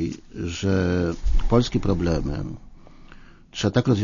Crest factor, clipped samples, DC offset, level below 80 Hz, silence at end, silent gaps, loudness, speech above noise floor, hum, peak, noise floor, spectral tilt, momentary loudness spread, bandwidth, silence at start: 18 dB; under 0.1%; under 0.1%; -30 dBFS; 0 s; none; -24 LUFS; 24 dB; none; -4 dBFS; -45 dBFS; -6.5 dB/octave; 12 LU; 7.4 kHz; 0 s